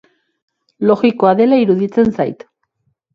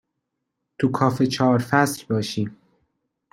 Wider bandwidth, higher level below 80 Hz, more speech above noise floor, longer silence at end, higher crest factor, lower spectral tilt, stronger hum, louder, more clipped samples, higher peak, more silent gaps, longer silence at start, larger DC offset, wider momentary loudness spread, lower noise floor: second, 6.4 kHz vs 16.5 kHz; first, -54 dBFS vs -60 dBFS; second, 54 dB vs 58 dB; about the same, 0.8 s vs 0.8 s; second, 16 dB vs 22 dB; first, -8.5 dB/octave vs -6 dB/octave; neither; first, -14 LUFS vs -22 LUFS; neither; about the same, 0 dBFS vs -2 dBFS; neither; about the same, 0.8 s vs 0.8 s; neither; about the same, 9 LU vs 9 LU; second, -67 dBFS vs -79 dBFS